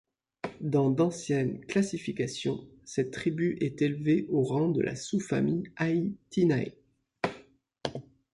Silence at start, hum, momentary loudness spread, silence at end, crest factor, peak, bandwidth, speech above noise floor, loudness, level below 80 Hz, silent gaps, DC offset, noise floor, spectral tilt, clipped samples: 0.45 s; none; 12 LU; 0.3 s; 18 dB; -12 dBFS; 11.5 kHz; 28 dB; -30 LUFS; -64 dBFS; none; under 0.1%; -57 dBFS; -6.5 dB/octave; under 0.1%